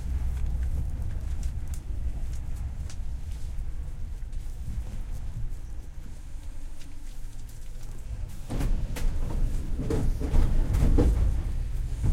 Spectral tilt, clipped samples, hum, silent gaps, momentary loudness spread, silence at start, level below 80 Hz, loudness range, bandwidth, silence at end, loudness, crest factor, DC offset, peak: -7 dB/octave; under 0.1%; none; none; 16 LU; 0 s; -28 dBFS; 12 LU; 12.5 kHz; 0 s; -33 LUFS; 20 dB; under 0.1%; -8 dBFS